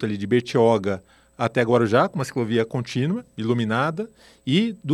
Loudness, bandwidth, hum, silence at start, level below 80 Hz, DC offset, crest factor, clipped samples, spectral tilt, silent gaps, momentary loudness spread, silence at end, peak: -22 LUFS; 12.5 kHz; none; 0 s; -62 dBFS; under 0.1%; 18 dB; under 0.1%; -6.5 dB/octave; none; 10 LU; 0 s; -4 dBFS